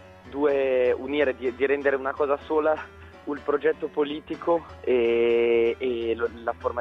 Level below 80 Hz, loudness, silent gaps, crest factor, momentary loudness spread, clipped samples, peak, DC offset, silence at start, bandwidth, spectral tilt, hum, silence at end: -54 dBFS; -25 LUFS; none; 16 dB; 9 LU; under 0.1%; -8 dBFS; under 0.1%; 0 s; 6 kHz; -7 dB/octave; none; 0 s